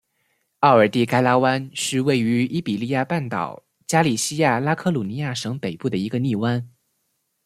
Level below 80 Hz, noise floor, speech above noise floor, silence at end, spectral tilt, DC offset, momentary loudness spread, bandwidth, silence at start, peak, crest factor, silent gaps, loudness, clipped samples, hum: -62 dBFS; -72 dBFS; 52 dB; 0.75 s; -5 dB/octave; under 0.1%; 10 LU; 15 kHz; 0.6 s; -2 dBFS; 20 dB; none; -21 LUFS; under 0.1%; none